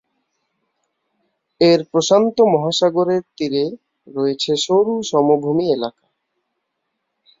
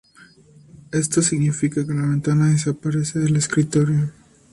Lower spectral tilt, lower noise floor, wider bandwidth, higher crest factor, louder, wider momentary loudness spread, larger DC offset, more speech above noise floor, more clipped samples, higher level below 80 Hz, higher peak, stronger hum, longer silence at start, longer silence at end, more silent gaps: about the same, -5 dB/octave vs -5.5 dB/octave; first, -75 dBFS vs -50 dBFS; second, 7.8 kHz vs 11.5 kHz; about the same, 16 dB vs 14 dB; first, -17 LUFS vs -20 LUFS; first, 8 LU vs 5 LU; neither; first, 58 dB vs 31 dB; neither; second, -64 dBFS vs -54 dBFS; first, -2 dBFS vs -6 dBFS; neither; first, 1.6 s vs 0.75 s; first, 1.5 s vs 0.4 s; neither